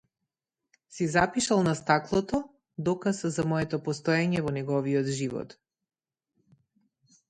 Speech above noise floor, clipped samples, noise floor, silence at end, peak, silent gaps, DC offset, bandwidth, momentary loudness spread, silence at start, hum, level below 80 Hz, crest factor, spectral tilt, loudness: 60 dB; under 0.1%; -87 dBFS; 1.85 s; -6 dBFS; none; under 0.1%; 11 kHz; 8 LU; 0.9 s; none; -58 dBFS; 22 dB; -5.5 dB/octave; -28 LUFS